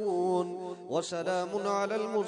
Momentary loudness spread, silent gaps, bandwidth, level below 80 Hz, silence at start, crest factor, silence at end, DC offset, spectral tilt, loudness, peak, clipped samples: 5 LU; none; 10.5 kHz; -84 dBFS; 0 s; 14 dB; 0 s; under 0.1%; -5 dB/octave; -32 LUFS; -18 dBFS; under 0.1%